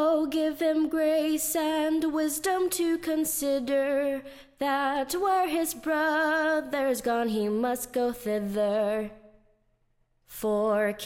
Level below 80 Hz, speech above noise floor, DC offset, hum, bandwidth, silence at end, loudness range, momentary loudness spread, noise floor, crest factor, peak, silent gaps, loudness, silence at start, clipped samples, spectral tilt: -60 dBFS; 43 dB; under 0.1%; none; 16.5 kHz; 0 s; 3 LU; 4 LU; -69 dBFS; 12 dB; -14 dBFS; none; -27 LUFS; 0 s; under 0.1%; -3.5 dB/octave